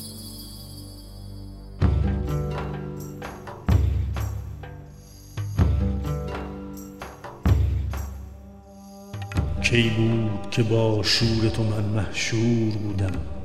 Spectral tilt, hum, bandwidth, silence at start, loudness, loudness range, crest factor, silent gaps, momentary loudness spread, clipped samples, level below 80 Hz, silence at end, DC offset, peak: -6 dB/octave; none; 14 kHz; 0 s; -25 LUFS; 7 LU; 20 dB; none; 20 LU; under 0.1%; -32 dBFS; 0 s; under 0.1%; -6 dBFS